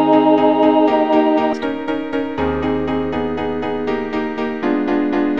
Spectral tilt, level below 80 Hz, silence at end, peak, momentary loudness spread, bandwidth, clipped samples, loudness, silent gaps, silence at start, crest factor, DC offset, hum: -7.5 dB/octave; -42 dBFS; 0 s; -2 dBFS; 8 LU; 6.4 kHz; under 0.1%; -17 LUFS; none; 0 s; 14 dB; 1%; none